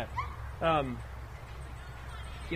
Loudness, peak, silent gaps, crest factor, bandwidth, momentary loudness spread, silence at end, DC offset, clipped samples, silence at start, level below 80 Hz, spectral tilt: -36 LUFS; -16 dBFS; none; 20 dB; 15.5 kHz; 16 LU; 0 s; under 0.1%; under 0.1%; 0 s; -44 dBFS; -6.5 dB/octave